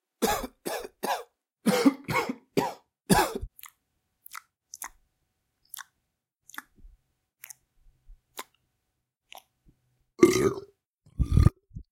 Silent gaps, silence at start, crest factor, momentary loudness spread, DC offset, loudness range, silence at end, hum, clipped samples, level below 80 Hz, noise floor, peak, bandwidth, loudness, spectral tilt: 10.94-10.98 s; 0.2 s; 28 dB; 24 LU; under 0.1%; 21 LU; 0.1 s; none; under 0.1%; -40 dBFS; -81 dBFS; -2 dBFS; 16.5 kHz; -27 LUFS; -5.5 dB/octave